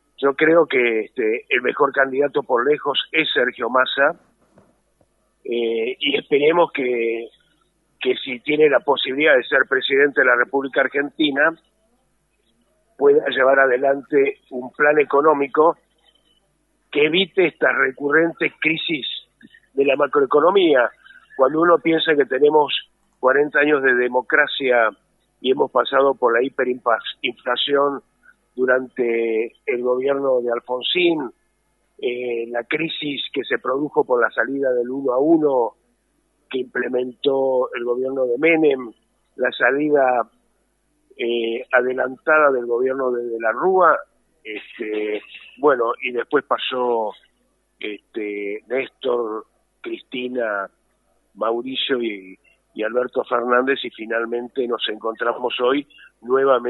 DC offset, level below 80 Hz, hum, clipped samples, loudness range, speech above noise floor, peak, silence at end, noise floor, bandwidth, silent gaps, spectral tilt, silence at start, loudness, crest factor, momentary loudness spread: under 0.1%; -70 dBFS; none; under 0.1%; 6 LU; 47 dB; -2 dBFS; 0 s; -66 dBFS; 4.1 kHz; none; -6.5 dB/octave; 0.2 s; -19 LUFS; 18 dB; 11 LU